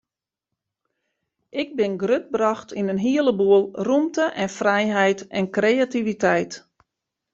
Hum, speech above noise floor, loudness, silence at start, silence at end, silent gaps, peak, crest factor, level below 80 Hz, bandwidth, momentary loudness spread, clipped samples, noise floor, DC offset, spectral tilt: none; 65 dB; -21 LUFS; 1.55 s; 0.75 s; none; -4 dBFS; 18 dB; -64 dBFS; 7.8 kHz; 8 LU; under 0.1%; -86 dBFS; under 0.1%; -5.5 dB/octave